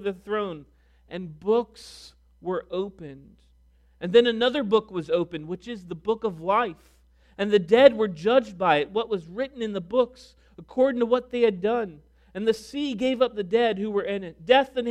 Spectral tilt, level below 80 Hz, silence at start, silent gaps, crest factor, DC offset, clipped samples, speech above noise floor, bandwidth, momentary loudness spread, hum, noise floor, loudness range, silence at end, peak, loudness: -6 dB/octave; -58 dBFS; 0 s; none; 24 dB; under 0.1%; under 0.1%; 34 dB; 11 kHz; 16 LU; none; -59 dBFS; 5 LU; 0 s; -2 dBFS; -24 LUFS